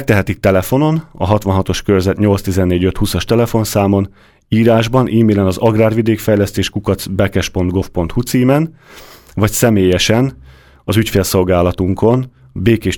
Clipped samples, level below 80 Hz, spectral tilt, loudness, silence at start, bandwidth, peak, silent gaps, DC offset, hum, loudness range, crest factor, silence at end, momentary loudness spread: under 0.1%; -34 dBFS; -6 dB/octave; -14 LUFS; 0 s; 19.5 kHz; 0 dBFS; none; under 0.1%; none; 2 LU; 14 dB; 0 s; 6 LU